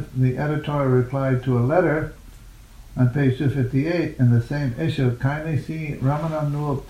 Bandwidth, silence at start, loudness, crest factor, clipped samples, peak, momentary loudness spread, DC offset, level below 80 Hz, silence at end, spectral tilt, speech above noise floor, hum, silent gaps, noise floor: 9.8 kHz; 0 s; -22 LUFS; 18 dB; under 0.1%; -4 dBFS; 7 LU; under 0.1%; -44 dBFS; 0 s; -8.5 dB/octave; 22 dB; none; none; -43 dBFS